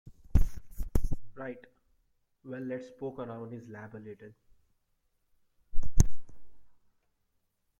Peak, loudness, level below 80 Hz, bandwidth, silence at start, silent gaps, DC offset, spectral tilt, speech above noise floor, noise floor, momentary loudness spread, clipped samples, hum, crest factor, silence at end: -8 dBFS; -37 LUFS; -36 dBFS; 13 kHz; 0.35 s; none; under 0.1%; -6.5 dB/octave; 35 dB; -77 dBFS; 17 LU; under 0.1%; none; 20 dB; 1.15 s